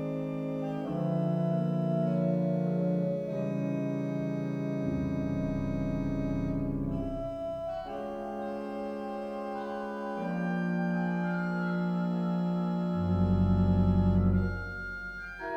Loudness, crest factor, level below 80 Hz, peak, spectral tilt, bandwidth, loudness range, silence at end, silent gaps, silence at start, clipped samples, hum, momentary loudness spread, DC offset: -31 LUFS; 14 dB; -44 dBFS; -16 dBFS; -9.5 dB/octave; 6.4 kHz; 7 LU; 0 s; none; 0 s; under 0.1%; none; 10 LU; under 0.1%